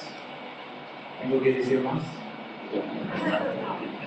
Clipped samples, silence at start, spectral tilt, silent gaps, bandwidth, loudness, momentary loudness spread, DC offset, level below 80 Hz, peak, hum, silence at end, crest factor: under 0.1%; 0 s; -7 dB/octave; none; 8.6 kHz; -29 LUFS; 16 LU; under 0.1%; -74 dBFS; -10 dBFS; none; 0 s; 18 dB